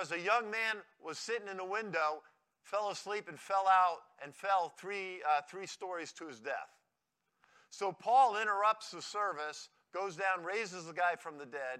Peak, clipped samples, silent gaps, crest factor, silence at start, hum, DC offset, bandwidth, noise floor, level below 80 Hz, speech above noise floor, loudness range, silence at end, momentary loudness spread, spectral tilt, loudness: -16 dBFS; under 0.1%; none; 20 dB; 0 s; none; under 0.1%; 13 kHz; -85 dBFS; under -90 dBFS; 49 dB; 5 LU; 0 s; 16 LU; -2.5 dB/octave; -35 LUFS